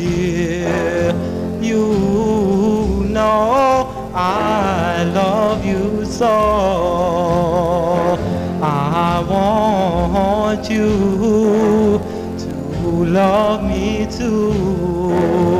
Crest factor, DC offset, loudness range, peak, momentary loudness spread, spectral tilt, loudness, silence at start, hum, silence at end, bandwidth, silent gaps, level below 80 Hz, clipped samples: 12 dB; 0.2%; 1 LU; -2 dBFS; 6 LU; -7 dB/octave; -16 LUFS; 0 s; none; 0 s; 15.5 kHz; none; -32 dBFS; under 0.1%